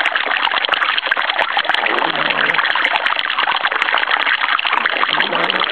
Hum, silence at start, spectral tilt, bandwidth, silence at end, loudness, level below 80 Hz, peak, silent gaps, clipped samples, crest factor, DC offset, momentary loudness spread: none; 0 s; -2.5 dB/octave; 11 kHz; 0 s; -15 LUFS; -64 dBFS; 0 dBFS; none; under 0.1%; 16 dB; 0.4%; 2 LU